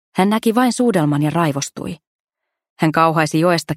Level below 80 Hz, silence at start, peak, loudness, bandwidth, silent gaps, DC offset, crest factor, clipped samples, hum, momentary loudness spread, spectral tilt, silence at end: -56 dBFS; 0.15 s; 0 dBFS; -17 LUFS; 15.5 kHz; 2.07-2.25 s, 2.70-2.76 s; under 0.1%; 18 dB; under 0.1%; none; 12 LU; -5.5 dB/octave; 0 s